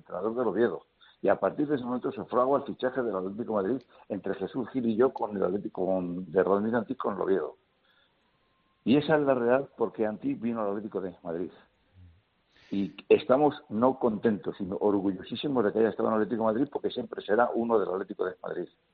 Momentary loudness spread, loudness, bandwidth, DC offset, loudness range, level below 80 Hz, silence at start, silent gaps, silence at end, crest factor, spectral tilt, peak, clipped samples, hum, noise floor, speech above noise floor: 11 LU; -29 LUFS; 4.7 kHz; under 0.1%; 3 LU; -70 dBFS; 0.1 s; none; 0.25 s; 20 dB; -5.5 dB/octave; -8 dBFS; under 0.1%; none; -70 dBFS; 42 dB